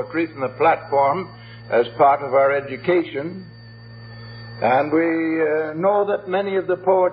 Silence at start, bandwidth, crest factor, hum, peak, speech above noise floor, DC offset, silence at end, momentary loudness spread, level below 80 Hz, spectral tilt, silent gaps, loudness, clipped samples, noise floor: 0 s; 5.4 kHz; 16 dB; none; -4 dBFS; 21 dB; under 0.1%; 0 s; 20 LU; -60 dBFS; -11 dB/octave; none; -20 LUFS; under 0.1%; -40 dBFS